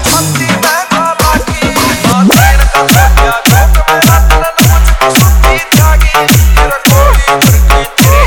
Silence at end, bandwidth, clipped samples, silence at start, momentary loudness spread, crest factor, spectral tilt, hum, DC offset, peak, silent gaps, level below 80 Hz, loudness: 0 s; 19.5 kHz; 1%; 0 s; 4 LU; 6 dB; -4 dB/octave; none; 0.2%; 0 dBFS; none; -10 dBFS; -7 LUFS